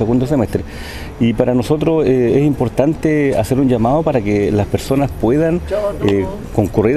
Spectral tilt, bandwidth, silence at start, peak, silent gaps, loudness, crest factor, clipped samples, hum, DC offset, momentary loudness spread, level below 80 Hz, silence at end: -7.5 dB/octave; 13.5 kHz; 0 s; 0 dBFS; none; -15 LUFS; 14 dB; under 0.1%; none; under 0.1%; 6 LU; -32 dBFS; 0 s